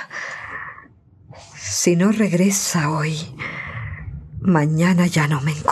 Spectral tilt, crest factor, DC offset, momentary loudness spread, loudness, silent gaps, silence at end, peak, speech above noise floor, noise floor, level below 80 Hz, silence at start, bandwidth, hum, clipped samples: -5 dB/octave; 20 dB; under 0.1%; 16 LU; -19 LUFS; none; 0 s; -2 dBFS; 31 dB; -48 dBFS; -48 dBFS; 0 s; 14 kHz; none; under 0.1%